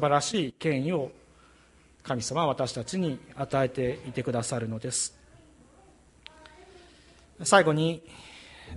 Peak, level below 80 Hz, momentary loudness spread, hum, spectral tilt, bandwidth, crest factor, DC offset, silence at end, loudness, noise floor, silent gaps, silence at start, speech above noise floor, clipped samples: -6 dBFS; -58 dBFS; 24 LU; none; -4.5 dB/octave; 11.5 kHz; 24 dB; under 0.1%; 0 s; -28 LUFS; -58 dBFS; none; 0 s; 31 dB; under 0.1%